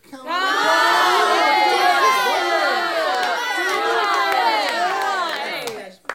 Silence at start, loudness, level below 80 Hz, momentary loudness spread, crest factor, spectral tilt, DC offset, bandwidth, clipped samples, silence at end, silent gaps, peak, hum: 0.1 s; -18 LUFS; -68 dBFS; 9 LU; 16 dB; -0.5 dB/octave; under 0.1%; 17 kHz; under 0.1%; 0 s; none; -4 dBFS; none